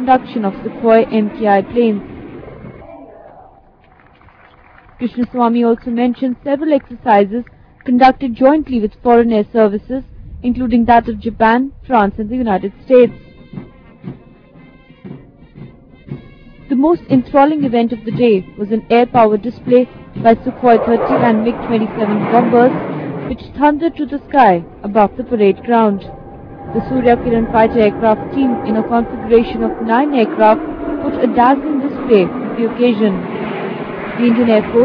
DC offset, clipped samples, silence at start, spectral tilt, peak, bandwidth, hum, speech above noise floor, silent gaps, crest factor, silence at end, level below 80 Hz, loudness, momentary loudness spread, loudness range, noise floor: under 0.1%; under 0.1%; 0 s; -9.5 dB/octave; 0 dBFS; 5.4 kHz; none; 34 dB; none; 14 dB; 0 s; -40 dBFS; -14 LUFS; 14 LU; 6 LU; -46 dBFS